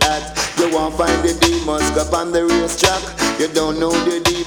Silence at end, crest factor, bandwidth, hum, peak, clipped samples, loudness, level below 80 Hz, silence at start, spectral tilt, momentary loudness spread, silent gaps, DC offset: 0 s; 16 dB; 19.5 kHz; none; 0 dBFS; under 0.1%; -17 LUFS; -32 dBFS; 0 s; -3 dB/octave; 3 LU; none; under 0.1%